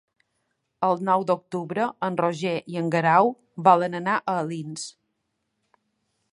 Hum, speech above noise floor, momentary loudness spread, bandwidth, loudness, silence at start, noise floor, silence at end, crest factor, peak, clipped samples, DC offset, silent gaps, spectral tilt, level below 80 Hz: none; 54 dB; 12 LU; 11 kHz; -24 LUFS; 0.8 s; -77 dBFS; 1.45 s; 22 dB; -4 dBFS; under 0.1%; under 0.1%; none; -6 dB/octave; -74 dBFS